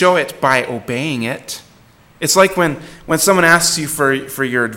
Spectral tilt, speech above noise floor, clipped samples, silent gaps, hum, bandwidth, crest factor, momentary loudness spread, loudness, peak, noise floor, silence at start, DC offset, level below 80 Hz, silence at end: -3 dB/octave; 32 dB; under 0.1%; none; none; 17.5 kHz; 16 dB; 12 LU; -15 LUFS; 0 dBFS; -47 dBFS; 0 s; under 0.1%; -48 dBFS; 0 s